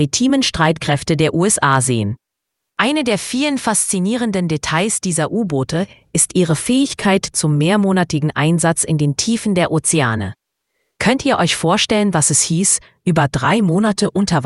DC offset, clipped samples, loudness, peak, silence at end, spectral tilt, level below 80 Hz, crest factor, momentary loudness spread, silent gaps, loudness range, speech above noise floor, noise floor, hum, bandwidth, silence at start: under 0.1%; under 0.1%; -16 LUFS; 0 dBFS; 0 s; -4 dB/octave; -46 dBFS; 16 dB; 5 LU; none; 2 LU; 62 dB; -78 dBFS; none; 12 kHz; 0 s